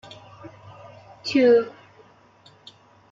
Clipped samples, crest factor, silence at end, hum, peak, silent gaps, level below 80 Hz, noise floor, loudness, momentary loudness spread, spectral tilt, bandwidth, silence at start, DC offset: under 0.1%; 18 dB; 1.45 s; none; -8 dBFS; none; -70 dBFS; -54 dBFS; -20 LUFS; 28 LU; -5.5 dB/octave; 7.4 kHz; 0.45 s; under 0.1%